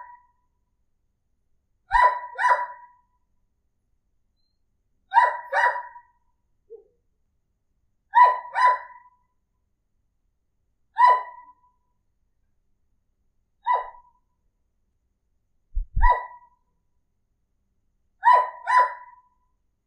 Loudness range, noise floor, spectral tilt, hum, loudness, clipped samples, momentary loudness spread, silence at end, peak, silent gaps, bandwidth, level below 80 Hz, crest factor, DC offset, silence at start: 10 LU; -73 dBFS; -3.5 dB/octave; none; -21 LUFS; under 0.1%; 18 LU; 0.9 s; -4 dBFS; none; 9.6 kHz; -38 dBFS; 22 dB; under 0.1%; 0 s